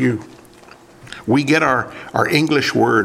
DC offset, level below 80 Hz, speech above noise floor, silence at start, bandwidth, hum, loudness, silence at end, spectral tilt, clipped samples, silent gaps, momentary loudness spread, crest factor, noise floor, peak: under 0.1%; -54 dBFS; 27 dB; 0 s; 15.5 kHz; none; -17 LUFS; 0 s; -5.5 dB/octave; under 0.1%; none; 13 LU; 18 dB; -44 dBFS; 0 dBFS